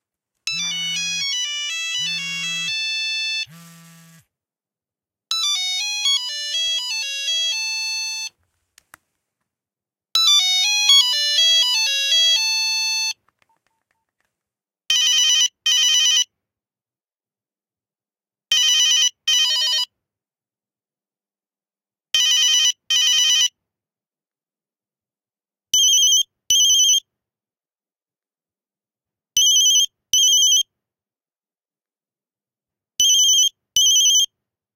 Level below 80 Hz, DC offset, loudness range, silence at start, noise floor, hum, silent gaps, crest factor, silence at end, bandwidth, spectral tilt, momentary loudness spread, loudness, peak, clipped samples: -66 dBFS; under 0.1%; 7 LU; 0.45 s; under -90 dBFS; none; none; 18 dB; 0.5 s; 17 kHz; 4 dB/octave; 11 LU; -16 LUFS; -2 dBFS; under 0.1%